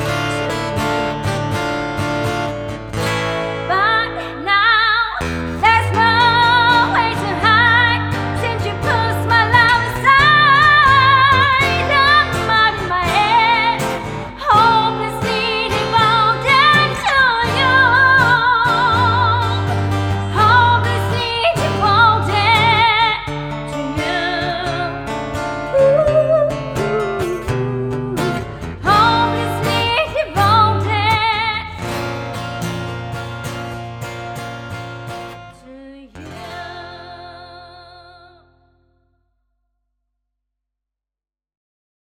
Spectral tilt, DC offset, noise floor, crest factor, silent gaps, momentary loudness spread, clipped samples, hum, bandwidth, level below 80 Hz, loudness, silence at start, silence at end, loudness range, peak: -5 dB/octave; under 0.1%; -90 dBFS; 16 dB; none; 16 LU; under 0.1%; 50 Hz at -40 dBFS; 17 kHz; -38 dBFS; -14 LUFS; 0 s; 4 s; 16 LU; 0 dBFS